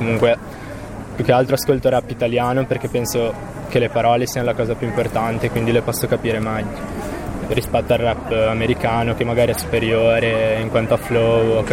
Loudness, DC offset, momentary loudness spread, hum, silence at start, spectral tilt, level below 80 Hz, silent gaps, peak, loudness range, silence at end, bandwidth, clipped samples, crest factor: -19 LUFS; under 0.1%; 10 LU; none; 0 s; -5.5 dB/octave; -36 dBFS; none; -4 dBFS; 3 LU; 0 s; 16.5 kHz; under 0.1%; 14 dB